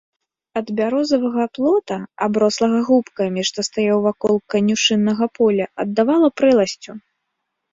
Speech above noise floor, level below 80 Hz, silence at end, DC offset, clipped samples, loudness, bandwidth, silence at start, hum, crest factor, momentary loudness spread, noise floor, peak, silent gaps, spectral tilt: 59 dB; -60 dBFS; 0.75 s; under 0.1%; under 0.1%; -18 LUFS; 7.8 kHz; 0.55 s; none; 14 dB; 8 LU; -76 dBFS; -4 dBFS; none; -4.5 dB/octave